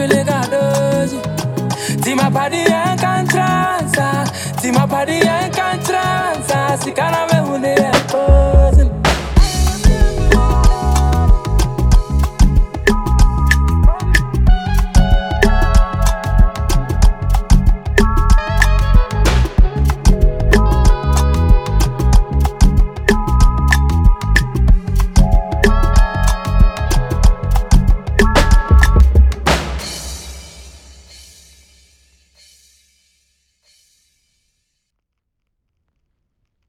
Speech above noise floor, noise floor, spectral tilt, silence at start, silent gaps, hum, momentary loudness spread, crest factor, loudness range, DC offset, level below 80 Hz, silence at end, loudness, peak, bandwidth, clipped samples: 58 dB; -74 dBFS; -5.5 dB/octave; 0 s; none; none; 5 LU; 12 dB; 2 LU; under 0.1%; -14 dBFS; 6 s; -15 LUFS; 0 dBFS; 15.5 kHz; under 0.1%